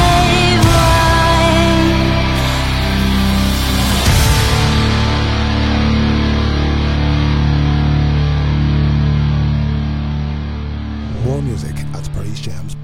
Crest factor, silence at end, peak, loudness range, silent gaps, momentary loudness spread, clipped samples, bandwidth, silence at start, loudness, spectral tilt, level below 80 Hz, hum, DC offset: 12 dB; 0 s; 0 dBFS; 5 LU; none; 12 LU; under 0.1%; 16.5 kHz; 0 s; -14 LUFS; -5.5 dB/octave; -18 dBFS; none; under 0.1%